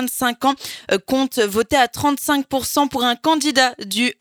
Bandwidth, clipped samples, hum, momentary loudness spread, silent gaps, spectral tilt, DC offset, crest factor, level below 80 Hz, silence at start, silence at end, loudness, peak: over 20 kHz; under 0.1%; none; 4 LU; none; -2.5 dB/octave; under 0.1%; 18 dB; -52 dBFS; 0 s; 0.1 s; -18 LUFS; -2 dBFS